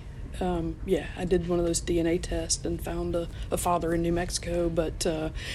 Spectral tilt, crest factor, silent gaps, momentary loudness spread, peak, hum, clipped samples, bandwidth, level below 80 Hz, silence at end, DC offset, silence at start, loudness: -5 dB/octave; 16 dB; none; 6 LU; -12 dBFS; none; under 0.1%; 14.5 kHz; -38 dBFS; 0 s; under 0.1%; 0 s; -29 LUFS